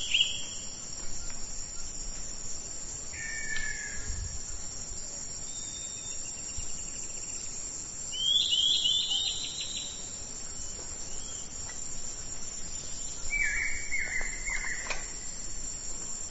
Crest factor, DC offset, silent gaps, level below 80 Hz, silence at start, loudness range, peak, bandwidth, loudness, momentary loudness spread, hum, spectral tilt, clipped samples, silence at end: 22 dB; under 0.1%; none; -44 dBFS; 0 s; 9 LU; -12 dBFS; 8.2 kHz; -32 LUFS; 12 LU; none; 0.5 dB/octave; under 0.1%; 0 s